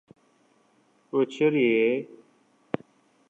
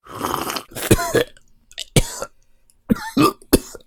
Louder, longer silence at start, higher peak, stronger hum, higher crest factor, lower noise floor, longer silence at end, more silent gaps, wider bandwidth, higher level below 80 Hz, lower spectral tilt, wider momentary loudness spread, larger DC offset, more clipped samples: second, -25 LUFS vs -20 LUFS; first, 1.15 s vs 0.05 s; second, -10 dBFS vs 0 dBFS; neither; about the same, 18 dB vs 22 dB; first, -64 dBFS vs -54 dBFS; first, 1.25 s vs 0.1 s; neither; second, 8 kHz vs 19.5 kHz; second, -76 dBFS vs -32 dBFS; first, -7 dB/octave vs -4.5 dB/octave; about the same, 14 LU vs 15 LU; neither; neither